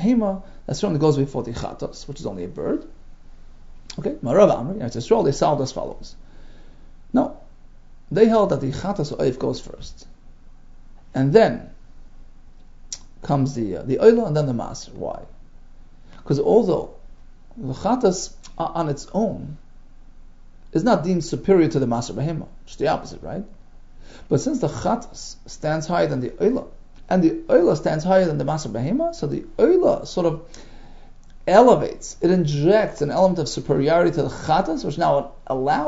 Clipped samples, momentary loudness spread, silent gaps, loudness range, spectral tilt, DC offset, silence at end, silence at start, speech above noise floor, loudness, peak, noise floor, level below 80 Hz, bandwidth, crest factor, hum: under 0.1%; 16 LU; none; 6 LU; -6.5 dB/octave; under 0.1%; 0 s; 0 s; 22 dB; -21 LUFS; 0 dBFS; -42 dBFS; -42 dBFS; 8 kHz; 22 dB; none